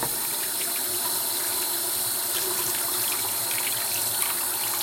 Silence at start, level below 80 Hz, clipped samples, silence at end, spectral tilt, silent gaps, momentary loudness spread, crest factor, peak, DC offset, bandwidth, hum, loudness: 0 s; -64 dBFS; under 0.1%; 0 s; 0 dB/octave; none; 1 LU; 22 dB; -6 dBFS; under 0.1%; 16.5 kHz; none; -24 LUFS